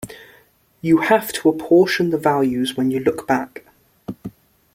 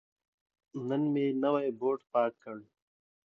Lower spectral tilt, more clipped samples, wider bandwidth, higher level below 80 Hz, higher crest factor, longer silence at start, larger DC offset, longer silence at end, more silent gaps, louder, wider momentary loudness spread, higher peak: second, -5.5 dB/octave vs -9 dB/octave; neither; first, 16.5 kHz vs 5.8 kHz; first, -56 dBFS vs -84 dBFS; about the same, 18 dB vs 18 dB; second, 0 s vs 0.75 s; neither; second, 0.45 s vs 0.65 s; neither; first, -18 LUFS vs -31 LUFS; first, 20 LU vs 17 LU; first, -2 dBFS vs -14 dBFS